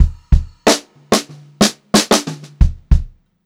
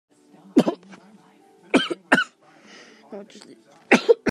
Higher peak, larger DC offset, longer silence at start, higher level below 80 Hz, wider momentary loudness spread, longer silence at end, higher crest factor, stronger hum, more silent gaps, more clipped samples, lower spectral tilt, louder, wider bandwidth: about the same, 0 dBFS vs 0 dBFS; neither; second, 0 s vs 0.55 s; first, -20 dBFS vs -66 dBFS; second, 6 LU vs 23 LU; first, 0.4 s vs 0 s; second, 16 dB vs 24 dB; neither; neither; neither; about the same, -4 dB/octave vs -4.5 dB/octave; first, -16 LUFS vs -21 LUFS; first, 16.5 kHz vs 13.5 kHz